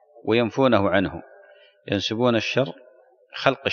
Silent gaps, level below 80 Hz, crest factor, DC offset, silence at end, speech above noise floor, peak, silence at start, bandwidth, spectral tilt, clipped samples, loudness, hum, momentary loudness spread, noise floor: none; -58 dBFS; 22 dB; under 0.1%; 0 s; 30 dB; -2 dBFS; 0.15 s; 7.2 kHz; -6 dB/octave; under 0.1%; -22 LUFS; none; 10 LU; -52 dBFS